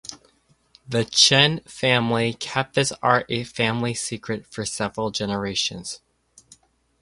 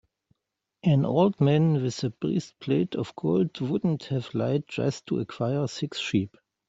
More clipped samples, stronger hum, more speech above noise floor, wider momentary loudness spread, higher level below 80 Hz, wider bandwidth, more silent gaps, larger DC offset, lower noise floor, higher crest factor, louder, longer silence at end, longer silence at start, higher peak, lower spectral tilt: neither; neither; second, 39 dB vs 58 dB; first, 15 LU vs 8 LU; first, -56 dBFS vs -64 dBFS; first, 11.5 kHz vs 8 kHz; neither; neither; second, -61 dBFS vs -84 dBFS; first, 24 dB vs 18 dB; first, -21 LUFS vs -27 LUFS; first, 1.05 s vs 0.4 s; second, 0.1 s vs 0.85 s; first, 0 dBFS vs -8 dBFS; second, -3 dB/octave vs -7 dB/octave